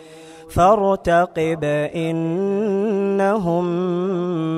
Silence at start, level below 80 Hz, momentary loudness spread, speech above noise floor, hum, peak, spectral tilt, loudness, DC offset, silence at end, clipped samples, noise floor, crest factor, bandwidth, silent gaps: 0 s; -44 dBFS; 6 LU; 22 dB; none; -2 dBFS; -7.5 dB/octave; -19 LUFS; under 0.1%; 0 s; under 0.1%; -41 dBFS; 16 dB; 14.5 kHz; none